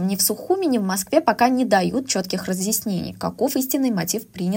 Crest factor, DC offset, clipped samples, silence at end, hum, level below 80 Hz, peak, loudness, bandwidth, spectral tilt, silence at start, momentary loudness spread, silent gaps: 18 dB; under 0.1%; under 0.1%; 0 s; none; -58 dBFS; -2 dBFS; -21 LUFS; 17 kHz; -4 dB/octave; 0 s; 7 LU; none